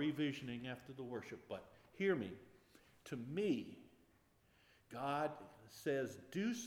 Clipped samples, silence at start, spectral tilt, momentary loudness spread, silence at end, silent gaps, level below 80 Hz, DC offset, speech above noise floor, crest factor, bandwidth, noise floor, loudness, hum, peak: under 0.1%; 0 s; -5.5 dB/octave; 17 LU; 0 s; none; -80 dBFS; under 0.1%; 30 dB; 20 dB; 18.5 kHz; -73 dBFS; -44 LUFS; none; -24 dBFS